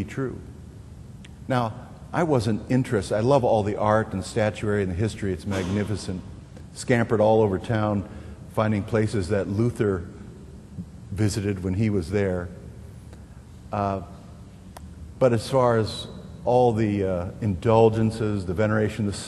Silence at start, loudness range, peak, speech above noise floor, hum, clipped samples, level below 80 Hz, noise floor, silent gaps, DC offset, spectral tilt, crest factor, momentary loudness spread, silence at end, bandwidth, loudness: 0 s; 6 LU; -4 dBFS; 20 dB; none; under 0.1%; -46 dBFS; -43 dBFS; none; under 0.1%; -7 dB/octave; 20 dB; 23 LU; 0 s; 12.5 kHz; -24 LUFS